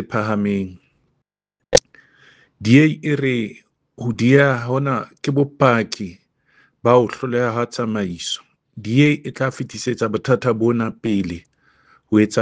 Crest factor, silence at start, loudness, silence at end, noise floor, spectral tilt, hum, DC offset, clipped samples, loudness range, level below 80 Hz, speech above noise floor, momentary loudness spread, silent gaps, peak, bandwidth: 20 dB; 0 s; -19 LUFS; 0 s; -79 dBFS; -6 dB/octave; none; under 0.1%; under 0.1%; 3 LU; -50 dBFS; 61 dB; 12 LU; none; 0 dBFS; 9.6 kHz